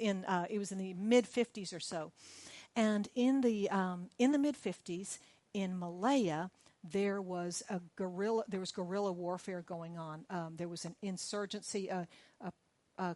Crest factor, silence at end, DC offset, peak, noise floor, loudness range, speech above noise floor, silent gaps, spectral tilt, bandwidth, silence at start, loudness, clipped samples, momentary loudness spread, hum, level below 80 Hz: 18 dB; 0 s; under 0.1%; -18 dBFS; -59 dBFS; 7 LU; 23 dB; none; -5 dB/octave; 11.5 kHz; 0 s; -37 LUFS; under 0.1%; 15 LU; none; -82 dBFS